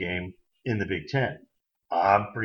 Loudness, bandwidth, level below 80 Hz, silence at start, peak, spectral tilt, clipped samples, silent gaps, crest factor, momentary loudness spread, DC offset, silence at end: -27 LUFS; 6.8 kHz; -58 dBFS; 0 s; -8 dBFS; -7.5 dB/octave; under 0.1%; none; 20 dB; 16 LU; under 0.1%; 0 s